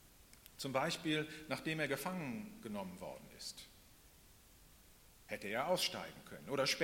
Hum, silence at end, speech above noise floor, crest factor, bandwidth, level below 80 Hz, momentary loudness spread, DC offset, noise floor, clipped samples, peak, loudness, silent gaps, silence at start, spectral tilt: none; 0 s; 23 dB; 22 dB; 16.5 kHz; -70 dBFS; 18 LU; under 0.1%; -64 dBFS; under 0.1%; -20 dBFS; -41 LUFS; none; 0 s; -3.5 dB/octave